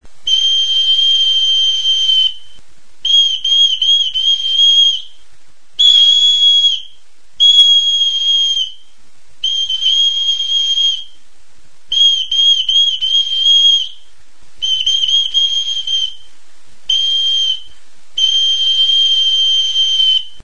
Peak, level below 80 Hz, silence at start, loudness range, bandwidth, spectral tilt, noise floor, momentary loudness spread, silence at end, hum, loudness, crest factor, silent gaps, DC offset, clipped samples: 0 dBFS; -52 dBFS; 0 s; 5 LU; 10.5 kHz; 3.5 dB/octave; -52 dBFS; 9 LU; 0.15 s; none; -10 LUFS; 14 dB; none; 4%; under 0.1%